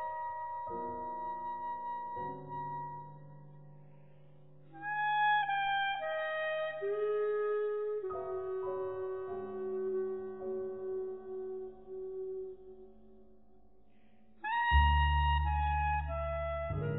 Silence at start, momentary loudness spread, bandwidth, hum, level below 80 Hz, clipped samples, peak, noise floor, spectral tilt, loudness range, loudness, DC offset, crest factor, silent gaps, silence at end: 0 s; 15 LU; 4 kHz; none; -42 dBFS; under 0.1%; -16 dBFS; -66 dBFS; -9 dB/octave; 11 LU; -35 LUFS; 0.1%; 20 dB; none; 0 s